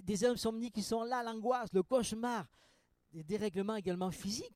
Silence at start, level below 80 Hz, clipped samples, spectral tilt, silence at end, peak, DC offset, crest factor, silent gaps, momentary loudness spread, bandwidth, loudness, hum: 0 s; -64 dBFS; under 0.1%; -5 dB/octave; 0.05 s; -20 dBFS; under 0.1%; 18 dB; none; 9 LU; 16 kHz; -37 LUFS; none